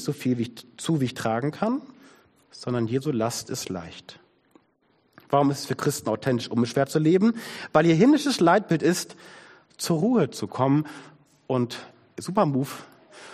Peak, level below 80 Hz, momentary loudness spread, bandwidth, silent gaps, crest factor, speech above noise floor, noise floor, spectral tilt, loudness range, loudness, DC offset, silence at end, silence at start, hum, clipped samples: -6 dBFS; -64 dBFS; 16 LU; 14.5 kHz; none; 20 dB; 42 dB; -66 dBFS; -6 dB/octave; 8 LU; -24 LUFS; under 0.1%; 0 s; 0 s; none; under 0.1%